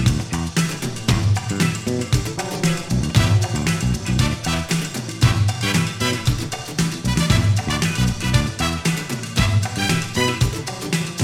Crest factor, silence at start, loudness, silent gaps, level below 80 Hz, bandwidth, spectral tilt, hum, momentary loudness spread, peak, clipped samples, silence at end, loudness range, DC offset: 18 dB; 0 s; -20 LUFS; none; -32 dBFS; 16.5 kHz; -4.5 dB/octave; none; 6 LU; -2 dBFS; under 0.1%; 0 s; 1 LU; under 0.1%